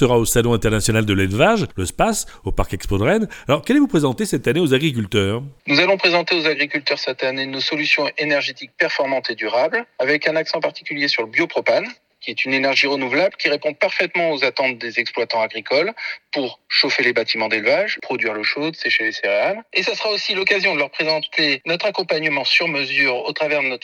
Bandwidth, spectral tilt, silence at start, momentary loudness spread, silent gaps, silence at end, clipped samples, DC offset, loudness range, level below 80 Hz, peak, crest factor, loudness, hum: 19 kHz; -4 dB/octave; 0 s; 6 LU; none; 0.05 s; under 0.1%; under 0.1%; 2 LU; -40 dBFS; -2 dBFS; 18 dB; -18 LUFS; none